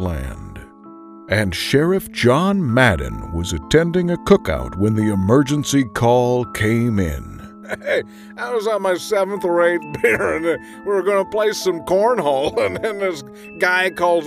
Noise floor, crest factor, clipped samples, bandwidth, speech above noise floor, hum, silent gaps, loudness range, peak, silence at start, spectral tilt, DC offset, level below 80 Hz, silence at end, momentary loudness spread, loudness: -40 dBFS; 18 dB; under 0.1%; 15.5 kHz; 22 dB; none; none; 3 LU; 0 dBFS; 0 s; -5.5 dB/octave; under 0.1%; -38 dBFS; 0 s; 12 LU; -18 LUFS